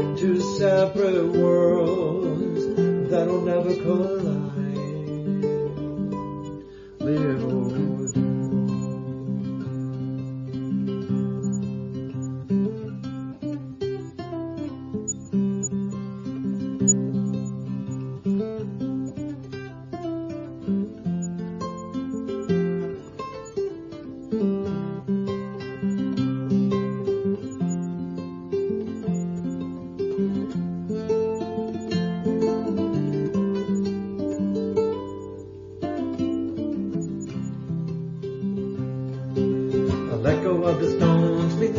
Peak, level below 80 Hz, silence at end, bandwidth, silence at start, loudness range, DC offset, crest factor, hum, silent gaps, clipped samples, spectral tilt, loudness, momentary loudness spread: -6 dBFS; -56 dBFS; 0 s; 7.4 kHz; 0 s; 6 LU; under 0.1%; 18 dB; none; none; under 0.1%; -6.5 dB/octave; -26 LUFS; 11 LU